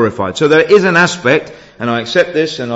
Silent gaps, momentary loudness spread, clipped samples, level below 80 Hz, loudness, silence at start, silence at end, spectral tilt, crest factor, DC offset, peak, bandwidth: none; 9 LU; under 0.1%; -52 dBFS; -12 LUFS; 0 s; 0 s; -5 dB/octave; 12 dB; under 0.1%; 0 dBFS; 8 kHz